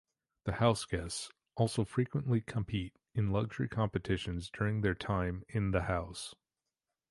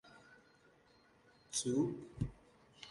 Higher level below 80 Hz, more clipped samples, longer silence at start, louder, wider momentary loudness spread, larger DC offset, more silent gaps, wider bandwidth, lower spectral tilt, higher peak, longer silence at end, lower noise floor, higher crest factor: first, -50 dBFS vs -62 dBFS; neither; first, 0.45 s vs 0.05 s; first, -35 LUFS vs -40 LUFS; second, 9 LU vs 23 LU; neither; neither; about the same, 11.5 kHz vs 11.5 kHz; first, -6 dB/octave vs -4.5 dB/octave; first, -14 dBFS vs -24 dBFS; first, 0.75 s vs 0 s; first, under -90 dBFS vs -69 dBFS; about the same, 22 dB vs 20 dB